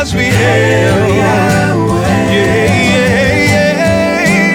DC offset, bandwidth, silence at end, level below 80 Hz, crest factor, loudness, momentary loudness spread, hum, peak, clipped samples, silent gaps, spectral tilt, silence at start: under 0.1%; 17 kHz; 0 s; -30 dBFS; 10 dB; -10 LUFS; 2 LU; none; 0 dBFS; under 0.1%; none; -5.5 dB/octave; 0 s